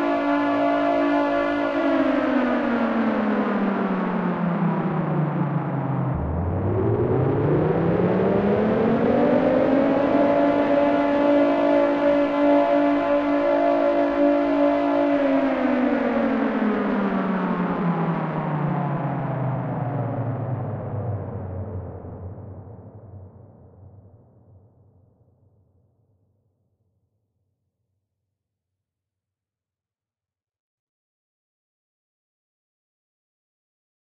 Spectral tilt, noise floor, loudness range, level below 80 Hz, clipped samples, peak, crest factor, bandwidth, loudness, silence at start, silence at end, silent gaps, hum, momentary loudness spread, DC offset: -9.5 dB/octave; under -90 dBFS; 11 LU; -48 dBFS; under 0.1%; -8 dBFS; 14 dB; 6.4 kHz; -22 LUFS; 0 s; 10.3 s; none; none; 9 LU; under 0.1%